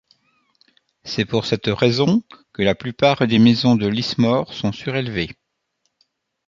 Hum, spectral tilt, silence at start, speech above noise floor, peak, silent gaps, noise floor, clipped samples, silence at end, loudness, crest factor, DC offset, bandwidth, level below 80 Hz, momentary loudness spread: none; -6.5 dB/octave; 1.05 s; 54 dB; -2 dBFS; none; -72 dBFS; under 0.1%; 1.15 s; -19 LUFS; 18 dB; under 0.1%; 7.4 kHz; -50 dBFS; 11 LU